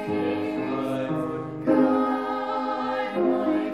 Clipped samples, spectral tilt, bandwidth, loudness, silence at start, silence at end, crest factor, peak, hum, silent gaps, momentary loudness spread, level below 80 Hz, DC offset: under 0.1%; -7.5 dB/octave; 12 kHz; -25 LUFS; 0 s; 0 s; 16 dB; -8 dBFS; none; none; 7 LU; -64 dBFS; 0.1%